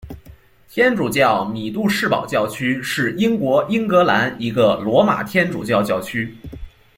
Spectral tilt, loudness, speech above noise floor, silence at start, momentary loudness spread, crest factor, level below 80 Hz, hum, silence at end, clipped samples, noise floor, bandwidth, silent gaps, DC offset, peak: -5.5 dB/octave; -18 LUFS; 27 dB; 0.05 s; 10 LU; 16 dB; -46 dBFS; none; 0.3 s; under 0.1%; -45 dBFS; 16.5 kHz; none; under 0.1%; -2 dBFS